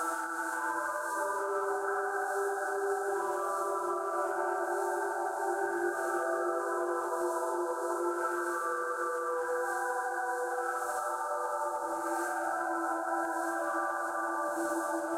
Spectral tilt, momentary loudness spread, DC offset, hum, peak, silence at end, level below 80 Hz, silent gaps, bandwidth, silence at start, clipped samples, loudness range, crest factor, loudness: -2 dB/octave; 1 LU; under 0.1%; none; -20 dBFS; 0 s; -82 dBFS; none; 16.5 kHz; 0 s; under 0.1%; 1 LU; 12 dB; -33 LUFS